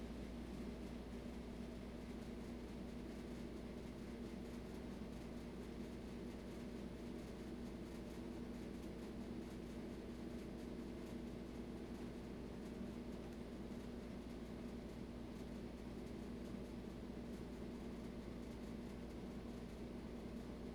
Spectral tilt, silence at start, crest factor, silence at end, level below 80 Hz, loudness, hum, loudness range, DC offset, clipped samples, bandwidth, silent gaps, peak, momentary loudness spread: -6.5 dB/octave; 0 s; 12 dB; 0 s; -58 dBFS; -51 LUFS; 60 Hz at -55 dBFS; 1 LU; under 0.1%; under 0.1%; over 20 kHz; none; -38 dBFS; 1 LU